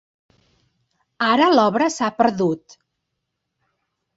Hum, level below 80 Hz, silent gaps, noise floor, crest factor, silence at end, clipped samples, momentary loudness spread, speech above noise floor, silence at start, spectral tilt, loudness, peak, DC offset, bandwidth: none; -66 dBFS; none; -78 dBFS; 20 dB; 1.6 s; under 0.1%; 8 LU; 60 dB; 1.2 s; -4.5 dB/octave; -18 LUFS; -2 dBFS; under 0.1%; 8 kHz